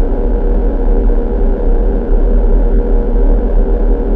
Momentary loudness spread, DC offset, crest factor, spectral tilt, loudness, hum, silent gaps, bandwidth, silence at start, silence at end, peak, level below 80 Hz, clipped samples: 2 LU; under 0.1%; 8 dB; -11.5 dB/octave; -15 LUFS; none; none; 2.1 kHz; 0 s; 0 s; -2 dBFS; -10 dBFS; under 0.1%